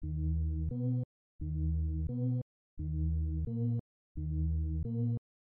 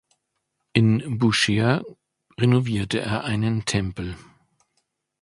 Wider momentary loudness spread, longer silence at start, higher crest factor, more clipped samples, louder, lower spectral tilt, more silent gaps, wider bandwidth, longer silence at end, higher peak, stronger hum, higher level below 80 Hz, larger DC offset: second, 8 LU vs 12 LU; second, 0 s vs 0.75 s; second, 10 dB vs 24 dB; neither; second, -36 LUFS vs -22 LUFS; first, -15.5 dB/octave vs -5.5 dB/octave; first, 1.05-1.39 s, 2.42-2.77 s, 3.80-4.15 s vs none; second, 1 kHz vs 11.5 kHz; second, 0.35 s vs 1.05 s; second, -24 dBFS vs 0 dBFS; neither; first, -40 dBFS vs -48 dBFS; neither